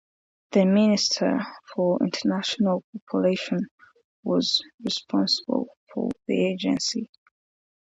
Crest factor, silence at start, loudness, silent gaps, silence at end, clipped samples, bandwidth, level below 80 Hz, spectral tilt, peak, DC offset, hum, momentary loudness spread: 18 dB; 0.5 s; -25 LUFS; 2.84-2.93 s, 3.02-3.07 s, 3.71-3.78 s, 4.05-4.23 s, 4.74-4.78 s, 5.77-5.87 s; 0.85 s; under 0.1%; 8 kHz; -68 dBFS; -5 dB/octave; -8 dBFS; under 0.1%; none; 10 LU